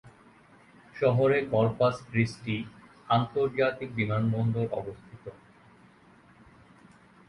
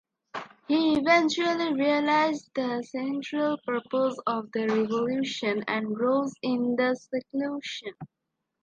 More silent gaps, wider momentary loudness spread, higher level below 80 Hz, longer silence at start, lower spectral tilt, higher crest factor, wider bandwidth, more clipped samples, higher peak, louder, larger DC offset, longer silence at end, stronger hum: neither; first, 20 LU vs 10 LU; first, -60 dBFS vs -70 dBFS; second, 0.05 s vs 0.35 s; first, -7.5 dB/octave vs -4.5 dB/octave; about the same, 20 dB vs 20 dB; first, 11 kHz vs 8.8 kHz; neither; about the same, -10 dBFS vs -8 dBFS; about the same, -28 LUFS vs -27 LUFS; neither; first, 1.95 s vs 0.6 s; neither